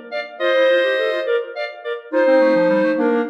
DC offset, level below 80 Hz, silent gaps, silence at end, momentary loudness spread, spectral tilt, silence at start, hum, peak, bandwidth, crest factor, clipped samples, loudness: under 0.1%; -80 dBFS; none; 0 s; 13 LU; -6 dB/octave; 0 s; none; -6 dBFS; 6.2 kHz; 12 dB; under 0.1%; -17 LUFS